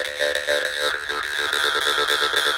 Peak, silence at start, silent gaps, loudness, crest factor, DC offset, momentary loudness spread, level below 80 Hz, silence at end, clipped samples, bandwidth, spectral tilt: -4 dBFS; 0 s; none; -21 LUFS; 18 dB; under 0.1%; 4 LU; -56 dBFS; 0 s; under 0.1%; 17 kHz; 0.5 dB/octave